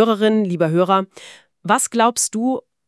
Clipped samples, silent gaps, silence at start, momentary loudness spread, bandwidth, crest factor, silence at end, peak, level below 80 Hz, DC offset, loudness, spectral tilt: under 0.1%; none; 0 s; 7 LU; 12 kHz; 18 dB; 0.3 s; 0 dBFS; -72 dBFS; under 0.1%; -18 LUFS; -4.5 dB/octave